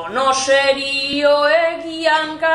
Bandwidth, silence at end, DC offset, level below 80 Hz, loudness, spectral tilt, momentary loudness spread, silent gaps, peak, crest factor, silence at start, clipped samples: 11.5 kHz; 0 s; under 0.1%; -58 dBFS; -16 LUFS; -1.5 dB/octave; 4 LU; none; -4 dBFS; 14 dB; 0 s; under 0.1%